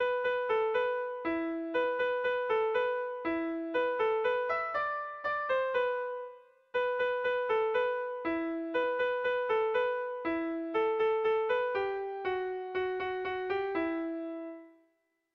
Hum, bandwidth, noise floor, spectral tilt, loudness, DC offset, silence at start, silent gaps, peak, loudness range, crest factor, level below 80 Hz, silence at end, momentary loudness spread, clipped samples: none; 6 kHz; -76 dBFS; -6 dB/octave; -32 LUFS; under 0.1%; 0 s; none; -20 dBFS; 2 LU; 12 dB; -70 dBFS; 0.65 s; 6 LU; under 0.1%